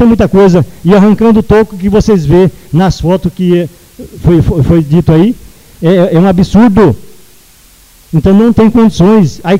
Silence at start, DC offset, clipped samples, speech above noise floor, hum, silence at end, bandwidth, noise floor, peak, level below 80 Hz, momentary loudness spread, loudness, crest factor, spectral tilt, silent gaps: 0 s; under 0.1%; 0.4%; 34 dB; none; 0 s; 15.5 kHz; -40 dBFS; 0 dBFS; -26 dBFS; 6 LU; -7 LUFS; 8 dB; -8 dB/octave; none